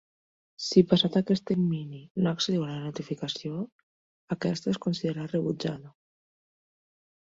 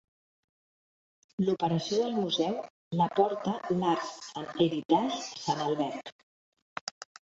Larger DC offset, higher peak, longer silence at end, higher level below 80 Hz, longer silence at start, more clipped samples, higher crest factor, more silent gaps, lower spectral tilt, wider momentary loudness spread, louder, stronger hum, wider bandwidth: neither; about the same, -8 dBFS vs -10 dBFS; first, 1.45 s vs 0.3 s; first, -66 dBFS vs -72 dBFS; second, 0.6 s vs 1.4 s; neither; about the same, 22 dB vs 20 dB; second, 2.10-2.15 s, 3.72-4.28 s vs 2.70-2.91 s, 4.85-4.89 s, 6.12-6.52 s, 6.62-6.87 s; about the same, -6 dB/octave vs -5.5 dB/octave; about the same, 13 LU vs 13 LU; about the same, -28 LUFS vs -30 LUFS; neither; about the same, 7.8 kHz vs 8 kHz